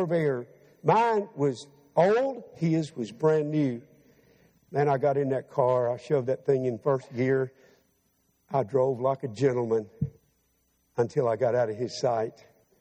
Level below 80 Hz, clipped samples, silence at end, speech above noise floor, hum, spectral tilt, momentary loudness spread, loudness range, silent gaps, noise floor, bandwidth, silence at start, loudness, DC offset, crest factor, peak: -66 dBFS; under 0.1%; 0.5 s; 45 dB; none; -7.5 dB/octave; 11 LU; 3 LU; none; -71 dBFS; 9.4 kHz; 0 s; -27 LUFS; under 0.1%; 20 dB; -8 dBFS